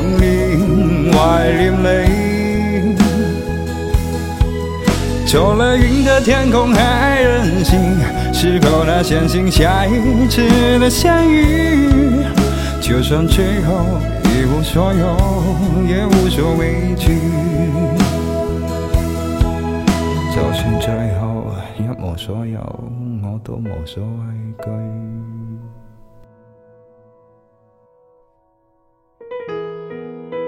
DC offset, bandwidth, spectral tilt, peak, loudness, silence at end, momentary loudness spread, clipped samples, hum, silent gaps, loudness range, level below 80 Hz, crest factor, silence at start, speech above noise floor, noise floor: under 0.1%; 16.5 kHz; -6 dB/octave; 0 dBFS; -15 LUFS; 0 s; 14 LU; under 0.1%; none; none; 15 LU; -22 dBFS; 14 dB; 0 s; 45 dB; -58 dBFS